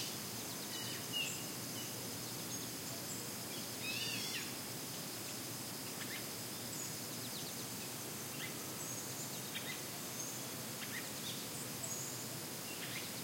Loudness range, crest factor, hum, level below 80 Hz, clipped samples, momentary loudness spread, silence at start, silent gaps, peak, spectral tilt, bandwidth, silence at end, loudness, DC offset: 1 LU; 16 dB; none; -78 dBFS; under 0.1%; 4 LU; 0 s; none; -28 dBFS; -2 dB/octave; 16.5 kHz; 0 s; -42 LUFS; under 0.1%